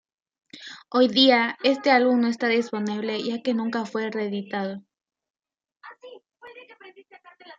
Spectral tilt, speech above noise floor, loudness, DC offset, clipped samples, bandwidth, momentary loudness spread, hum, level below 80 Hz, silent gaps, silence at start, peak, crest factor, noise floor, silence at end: -5 dB/octave; over 67 dB; -23 LUFS; under 0.1%; under 0.1%; 7.8 kHz; 20 LU; none; -78 dBFS; 5.30-5.34 s; 0.55 s; -6 dBFS; 20 dB; under -90 dBFS; 0.05 s